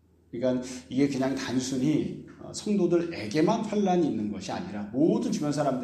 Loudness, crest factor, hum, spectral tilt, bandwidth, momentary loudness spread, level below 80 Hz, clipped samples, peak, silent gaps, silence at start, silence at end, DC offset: -28 LUFS; 16 dB; none; -6 dB/octave; 12.5 kHz; 9 LU; -62 dBFS; under 0.1%; -12 dBFS; none; 0.35 s; 0 s; under 0.1%